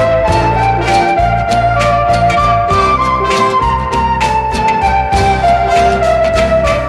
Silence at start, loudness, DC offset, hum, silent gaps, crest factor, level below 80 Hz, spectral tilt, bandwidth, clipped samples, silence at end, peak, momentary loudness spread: 0 s; -11 LUFS; under 0.1%; none; none; 10 dB; -22 dBFS; -5.5 dB/octave; 12.5 kHz; under 0.1%; 0 s; 0 dBFS; 3 LU